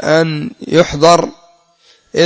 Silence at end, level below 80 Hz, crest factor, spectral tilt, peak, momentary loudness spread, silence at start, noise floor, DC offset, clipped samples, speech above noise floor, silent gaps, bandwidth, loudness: 0 s; -42 dBFS; 14 dB; -5 dB/octave; 0 dBFS; 13 LU; 0 s; -51 dBFS; under 0.1%; 0.3%; 39 dB; none; 8 kHz; -12 LUFS